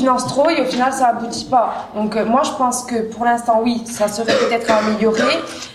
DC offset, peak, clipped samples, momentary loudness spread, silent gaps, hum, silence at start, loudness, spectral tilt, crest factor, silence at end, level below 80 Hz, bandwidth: under 0.1%; -2 dBFS; under 0.1%; 5 LU; none; none; 0 s; -17 LUFS; -4 dB/octave; 14 dB; 0 s; -52 dBFS; 14.5 kHz